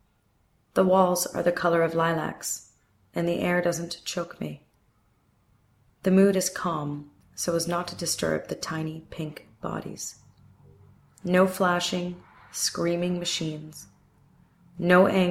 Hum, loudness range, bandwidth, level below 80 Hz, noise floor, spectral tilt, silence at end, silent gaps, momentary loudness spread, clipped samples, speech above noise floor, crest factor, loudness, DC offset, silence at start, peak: none; 6 LU; 16 kHz; -62 dBFS; -67 dBFS; -4.5 dB/octave; 0 s; none; 16 LU; under 0.1%; 42 dB; 20 dB; -26 LUFS; under 0.1%; 0.75 s; -6 dBFS